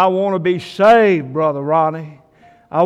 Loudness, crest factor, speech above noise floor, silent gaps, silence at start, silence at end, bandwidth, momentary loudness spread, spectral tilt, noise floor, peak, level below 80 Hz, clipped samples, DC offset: -15 LUFS; 12 dB; 34 dB; none; 0 s; 0 s; 11 kHz; 10 LU; -7 dB/octave; -49 dBFS; -2 dBFS; -58 dBFS; under 0.1%; under 0.1%